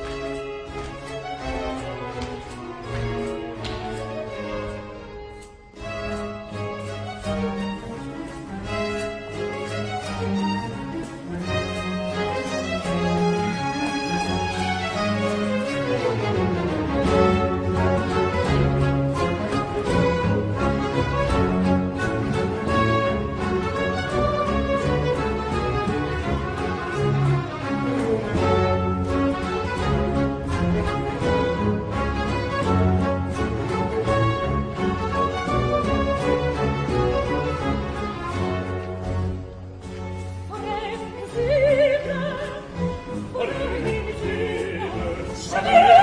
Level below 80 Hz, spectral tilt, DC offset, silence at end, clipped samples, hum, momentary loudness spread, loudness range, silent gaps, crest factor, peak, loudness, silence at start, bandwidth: -36 dBFS; -6.5 dB/octave; under 0.1%; 0 s; under 0.1%; none; 11 LU; 8 LU; none; 20 dB; -2 dBFS; -24 LUFS; 0 s; 10.5 kHz